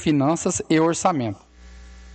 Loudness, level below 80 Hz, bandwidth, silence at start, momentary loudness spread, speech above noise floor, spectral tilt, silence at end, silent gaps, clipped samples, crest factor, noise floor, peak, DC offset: -21 LUFS; -48 dBFS; 9 kHz; 0 s; 10 LU; 23 dB; -5 dB/octave; 0 s; none; under 0.1%; 16 dB; -44 dBFS; -6 dBFS; under 0.1%